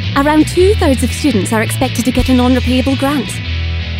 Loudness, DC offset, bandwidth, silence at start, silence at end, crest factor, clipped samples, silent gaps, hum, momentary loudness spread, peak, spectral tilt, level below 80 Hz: -13 LUFS; under 0.1%; 16.5 kHz; 0 s; 0 s; 12 dB; under 0.1%; none; none; 7 LU; 0 dBFS; -5.5 dB/octave; -24 dBFS